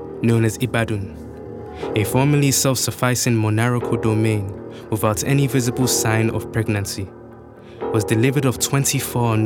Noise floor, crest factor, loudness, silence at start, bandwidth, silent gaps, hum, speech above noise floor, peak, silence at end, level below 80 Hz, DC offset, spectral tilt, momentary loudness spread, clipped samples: -40 dBFS; 18 dB; -19 LUFS; 0 s; 19 kHz; none; none; 21 dB; -2 dBFS; 0 s; -48 dBFS; under 0.1%; -5 dB/octave; 13 LU; under 0.1%